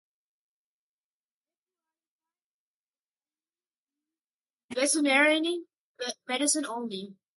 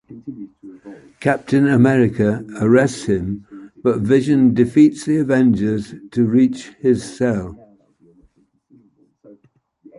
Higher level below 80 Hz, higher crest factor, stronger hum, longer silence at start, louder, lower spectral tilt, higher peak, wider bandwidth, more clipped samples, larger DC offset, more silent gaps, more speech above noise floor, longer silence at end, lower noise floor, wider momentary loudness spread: second, -84 dBFS vs -48 dBFS; first, 22 dB vs 16 dB; neither; first, 4.7 s vs 0.1 s; second, -26 LUFS vs -17 LUFS; second, -1 dB/octave vs -7.5 dB/octave; second, -10 dBFS vs -2 dBFS; about the same, 12 kHz vs 11.5 kHz; neither; neither; first, 5.77-5.95 s vs none; first, over 63 dB vs 43 dB; second, 0.25 s vs 2.45 s; first, under -90 dBFS vs -59 dBFS; about the same, 16 LU vs 17 LU